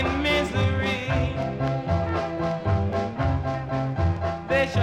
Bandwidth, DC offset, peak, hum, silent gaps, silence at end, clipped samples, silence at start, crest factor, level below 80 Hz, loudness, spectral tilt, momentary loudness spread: 10 kHz; under 0.1%; -8 dBFS; none; none; 0 s; under 0.1%; 0 s; 16 dB; -36 dBFS; -25 LUFS; -7 dB/octave; 5 LU